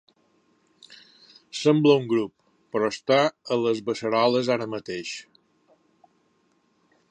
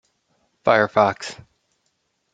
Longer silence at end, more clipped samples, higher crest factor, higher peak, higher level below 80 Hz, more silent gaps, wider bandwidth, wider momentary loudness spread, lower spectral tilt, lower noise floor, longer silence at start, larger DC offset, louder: first, 1.9 s vs 1 s; neither; about the same, 20 dB vs 22 dB; second, -6 dBFS vs -2 dBFS; second, -72 dBFS vs -64 dBFS; neither; about the same, 10 kHz vs 9.2 kHz; about the same, 14 LU vs 16 LU; about the same, -5.5 dB/octave vs -5 dB/octave; second, -67 dBFS vs -71 dBFS; first, 0.9 s vs 0.65 s; neither; second, -24 LUFS vs -19 LUFS